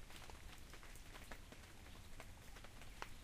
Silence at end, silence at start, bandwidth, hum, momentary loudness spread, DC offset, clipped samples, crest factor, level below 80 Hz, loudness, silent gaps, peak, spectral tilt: 0 s; 0 s; 15.5 kHz; none; 4 LU; under 0.1%; under 0.1%; 26 dB; -58 dBFS; -58 LUFS; none; -30 dBFS; -3.5 dB/octave